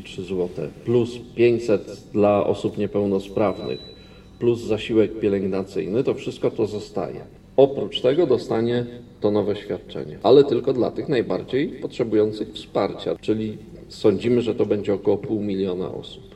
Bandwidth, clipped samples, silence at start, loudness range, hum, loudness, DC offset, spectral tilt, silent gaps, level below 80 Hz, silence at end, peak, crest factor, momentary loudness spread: 11 kHz; under 0.1%; 0 s; 3 LU; none; -22 LUFS; under 0.1%; -7.5 dB/octave; none; -52 dBFS; 0 s; -2 dBFS; 20 dB; 11 LU